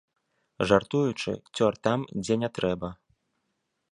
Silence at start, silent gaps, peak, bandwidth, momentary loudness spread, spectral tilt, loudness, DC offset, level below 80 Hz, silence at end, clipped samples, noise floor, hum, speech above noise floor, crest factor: 0.6 s; none; -4 dBFS; 11 kHz; 9 LU; -6 dB/octave; -27 LUFS; under 0.1%; -56 dBFS; 1 s; under 0.1%; -79 dBFS; none; 52 dB; 24 dB